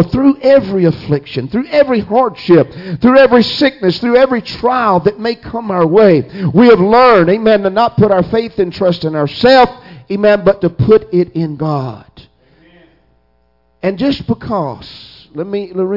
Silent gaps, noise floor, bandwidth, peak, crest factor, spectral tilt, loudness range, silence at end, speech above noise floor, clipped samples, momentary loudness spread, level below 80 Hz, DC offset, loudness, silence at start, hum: none; -56 dBFS; 5.8 kHz; 0 dBFS; 12 dB; -8 dB/octave; 11 LU; 0 s; 46 dB; under 0.1%; 12 LU; -42 dBFS; under 0.1%; -11 LUFS; 0 s; none